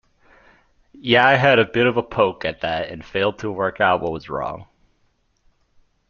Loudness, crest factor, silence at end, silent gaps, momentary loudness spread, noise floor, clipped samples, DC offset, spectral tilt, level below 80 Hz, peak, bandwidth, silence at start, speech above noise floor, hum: -19 LUFS; 20 dB; 1.45 s; none; 13 LU; -65 dBFS; under 0.1%; under 0.1%; -6.5 dB/octave; -52 dBFS; -2 dBFS; 7 kHz; 1.05 s; 45 dB; none